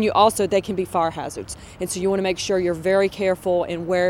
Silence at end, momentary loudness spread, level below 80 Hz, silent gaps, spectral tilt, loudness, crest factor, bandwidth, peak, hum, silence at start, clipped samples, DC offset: 0 s; 14 LU; -50 dBFS; none; -4.5 dB/octave; -22 LUFS; 18 dB; 17 kHz; -2 dBFS; none; 0 s; under 0.1%; under 0.1%